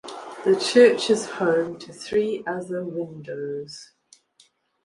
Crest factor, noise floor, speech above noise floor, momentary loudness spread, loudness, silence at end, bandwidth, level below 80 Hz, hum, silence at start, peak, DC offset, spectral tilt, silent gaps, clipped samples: 20 dB; -61 dBFS; 39 dB; 19 LU; -22 LUFS; 1 s; 11.5 kHz; -68 dBFS; none; 0.05 s; -2 dBFS; under 0.1%; -4.5 dB/octave; none; under 0.1%